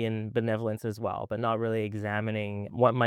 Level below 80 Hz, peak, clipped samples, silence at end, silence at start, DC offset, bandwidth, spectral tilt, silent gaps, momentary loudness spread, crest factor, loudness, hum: -68 dBFS; -8 dBFS; under 0.1%; 0 s; 0 s; under 0.1%; 14 kHz; -7.5 dB/octave; none; 6 LU; 20 dB; -30 LUFS; none